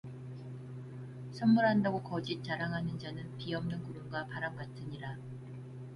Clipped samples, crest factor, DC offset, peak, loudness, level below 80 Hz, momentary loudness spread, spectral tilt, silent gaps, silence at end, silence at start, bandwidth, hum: under 0.1%; 18 dB; under 0.1%; -18 dBFS; -35 LUFS; -64 dBFS; 18 LU; -7.5 dB/octave; none; 0 s; 0.05 s; 11 kHz; none